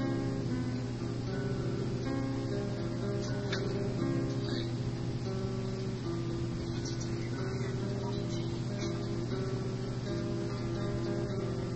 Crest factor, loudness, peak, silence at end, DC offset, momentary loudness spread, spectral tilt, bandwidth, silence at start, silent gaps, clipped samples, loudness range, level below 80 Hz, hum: 14 dB; -35 LUFS; -20 dBFS; 0 s; under 0.1%; 3 LU; -7 dB/octave; 8.4 kHz; 0 s; none; under 0.1%; 1 LU; -50 dBFS; none